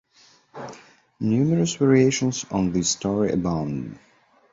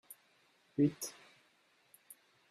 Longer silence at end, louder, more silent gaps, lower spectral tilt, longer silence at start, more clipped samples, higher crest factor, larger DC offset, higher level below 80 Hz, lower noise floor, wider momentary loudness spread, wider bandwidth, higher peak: second, 0.55 s vs 1.4 s; first, -22 LUFS vs -36 LUFS; neither; about the same, -5.5 dB/octave vs -6 dB/octave; first, 0.55 s vs 0.1 s; neither; about the same, 18 dB vs 22 dB; neither; first, -50 dBFS vs -78 dBFS; second, -57 dBFS vs -72 dBFS; second, 20 LU vs 25 LU; second, 8 kHz vs 15 kHz; first, -6 dBFS vs -20 dBFS